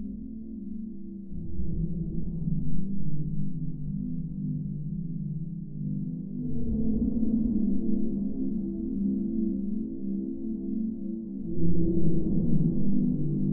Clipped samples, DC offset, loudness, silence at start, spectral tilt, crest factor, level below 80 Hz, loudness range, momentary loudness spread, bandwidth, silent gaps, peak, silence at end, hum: under 0.1%; under 0.1%; -31 LUFS; 0 s; -16 dB/octave; 14 dB; -40 dBFS; 5 LU; 10 LU; 1.1 kHz; none; -10 dBFS; 0 s; none